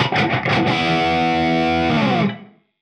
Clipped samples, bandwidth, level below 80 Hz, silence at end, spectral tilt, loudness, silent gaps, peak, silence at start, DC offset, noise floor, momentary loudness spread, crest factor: under 0.1%; 10 kHz; -44 dBFS; 0.4 s; -6 dB/octave; -18 LUFS; none; -4 dBFS; 0 s; under 0.1%; -38 dBFS; 3 LU; 14 dB